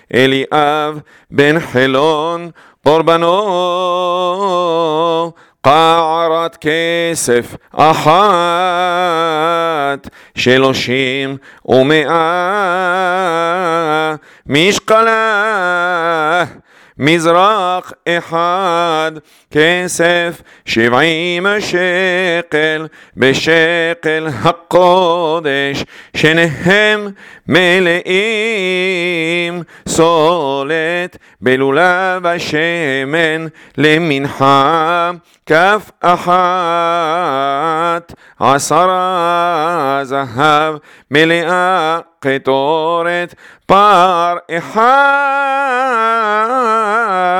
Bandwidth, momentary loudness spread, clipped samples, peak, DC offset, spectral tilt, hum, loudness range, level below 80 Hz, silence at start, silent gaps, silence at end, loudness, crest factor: 18 kHz; 8 LU; 0.1%; 0 dBFS; under 0.1%; -4.5 dB/octave; none; 2 LU; -52 dBFS; 0.15 s; none; 0 s; -12 LUFS; 12 dB